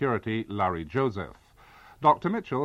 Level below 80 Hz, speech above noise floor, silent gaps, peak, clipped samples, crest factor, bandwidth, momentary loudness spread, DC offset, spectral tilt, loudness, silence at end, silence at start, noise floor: -56 dBFS; 26 dB; none; -6 dBFS; under 0.1%; 22 dB; 12.5 kHz; 9 LU; under 0.1%; -8 dB/octave; -27 LUFS; 0 s; 0 s; -53 dBFS